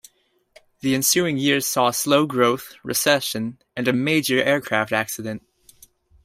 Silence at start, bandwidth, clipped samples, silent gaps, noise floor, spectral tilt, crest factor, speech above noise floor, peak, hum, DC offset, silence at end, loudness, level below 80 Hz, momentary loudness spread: 0.85 s; 16 kHz; under 0.1%; none; -63 dBFS; -3.5 dB/octave; 18 dB; 42 dB; -4 dBFS; none; under 0.1%; 0.85 s; -20 LUFS; -62 dBFS; 11 LU